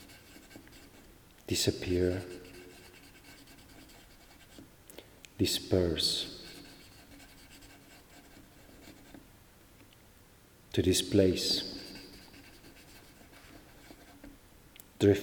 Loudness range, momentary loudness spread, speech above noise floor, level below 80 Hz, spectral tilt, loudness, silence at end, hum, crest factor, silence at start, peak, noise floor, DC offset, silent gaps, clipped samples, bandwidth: 21 LU; 26 LU; 29 dB; -58 dBFS; -4.5 dB/octave; -30 LUFS; 0 s; none; 26 dB; 0 s; -10 dBFS; -59 dBFS; under 0.1%; none; under 0.1%; over 20 kHz